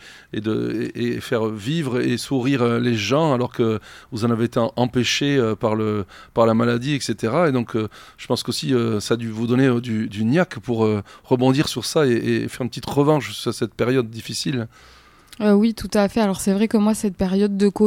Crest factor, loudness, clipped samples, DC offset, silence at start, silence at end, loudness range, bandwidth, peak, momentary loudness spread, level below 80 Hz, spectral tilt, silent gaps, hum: 18 dB; -21 LUFS; under 0.1%; under 0.1%; 0 s; 0 s; 2 LU; 16.5 kHz; -4 dBFS; 8 LU; -52 dBFS; -6 dB/octave; none; none